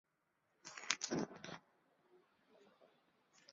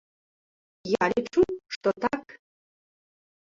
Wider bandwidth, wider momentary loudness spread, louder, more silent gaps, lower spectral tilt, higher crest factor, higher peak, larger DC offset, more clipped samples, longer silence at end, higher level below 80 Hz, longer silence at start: about the same, 7.4 kHz vs 7.6 kHz; first, 17 LU vs 8 LU; second, -44 LUFS vs -27 LUFS; second, none vs 1.76-1.81 s; second, -2.5 dB/octave vs -5.5 dB/octave; first, 40 dB vs 20 dB; about the same, -10 dBFS vs -10 dBFS; neither; neither; second, 0 s vs 1.1 s; second, -84 dBFS vs -60 dBFS; second, 0.65 s vs 0.85 s